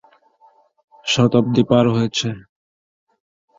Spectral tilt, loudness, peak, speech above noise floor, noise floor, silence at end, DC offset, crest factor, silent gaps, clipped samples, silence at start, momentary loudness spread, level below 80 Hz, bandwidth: -5.5 dB/octave; -17 LUFS; -2 dBFS; 38 dB; -55 dBFS; 1.2 s; under 0.1%; 18 dB; none; under 0.1%; 1.05 s; 13 LU; -54 dBFS; 7.8 kHz